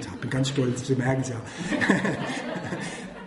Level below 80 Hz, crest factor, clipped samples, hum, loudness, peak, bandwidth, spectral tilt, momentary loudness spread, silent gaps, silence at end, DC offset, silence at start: -56 dBFS; 20 dB; under 0.1%; none; -27 LUFS; -6 dBFS; 11.5 kHz; -5.5 dB/octave; 10 LU; none; 0 s; under 0.1%; 0 s